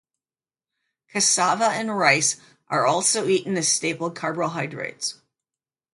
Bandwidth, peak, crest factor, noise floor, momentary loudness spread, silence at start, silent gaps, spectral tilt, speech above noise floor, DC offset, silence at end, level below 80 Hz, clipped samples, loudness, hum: 12 kHz; -2 dBFS; 22 dB; under -90 dBFS; 12 LU; 1.15 s; none; -2 dB/octave; over 67 dB; under 0.1%; 0.8 s; -72 dBFS; under 0.1%; -22 LUFS; none